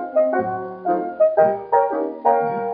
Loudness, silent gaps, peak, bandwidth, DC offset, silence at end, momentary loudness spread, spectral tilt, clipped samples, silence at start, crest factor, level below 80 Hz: -20 LUFS; none; -4 dBFS; 3.3 kHz; under 0.1%; 0 s; 7 LU; -7 dB/octave; under 0.1%; 0 s; 16 dB; -66 dBFS